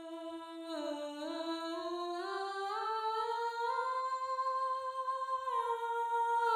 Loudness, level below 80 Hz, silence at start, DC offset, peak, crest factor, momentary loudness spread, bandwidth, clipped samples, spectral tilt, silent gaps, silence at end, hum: -37 LUFS; -84 dBFS; 0 s; under 0.1%; -20 dBFS; 16 dB; 6 LU; 16 kHz; under 0.1%; -1.5 dB/octave; none; 0 s; none